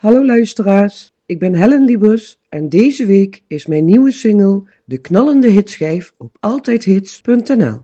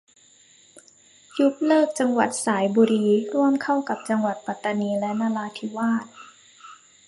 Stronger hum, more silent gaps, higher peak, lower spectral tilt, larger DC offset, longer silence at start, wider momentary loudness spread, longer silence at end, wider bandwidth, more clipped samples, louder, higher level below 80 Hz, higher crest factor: neither; neither; first, 0 dBFS vs -6 dBFS; first, -8 dB/octave vs -5 dB/octave; neither; second, 0.05 s vs 0.75 s; first, 12 LU vs 9 LU; second, 0.05 s vs 0.35 s; second, 8.2 kHz vs 11.5 kHz; first, 0.4% vs under 0.1%; first, -12 LUFS vs -23 LUFS; first, -56 dBFS vs -72 dBFS; second, 12 dB vs 18 dB